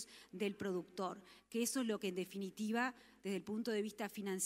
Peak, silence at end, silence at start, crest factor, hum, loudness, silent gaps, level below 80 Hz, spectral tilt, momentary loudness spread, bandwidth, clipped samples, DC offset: -24 dBFS; 0 s; 0 s; 18 dB; none; -42 LUFS; none; -82 dBFS; -4 dB/octave; 7 LU; 16 kHz; under 0.1%; under 0.1%